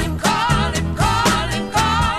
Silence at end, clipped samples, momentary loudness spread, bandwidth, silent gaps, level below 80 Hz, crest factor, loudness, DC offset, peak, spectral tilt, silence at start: 0 s; under 0.1%; 4 LU; 16 kHz; none; -28 dBFS; 14 dB; -18 LUFS; 0.4%; -4 dBFS; -4 dB/octave; 0 s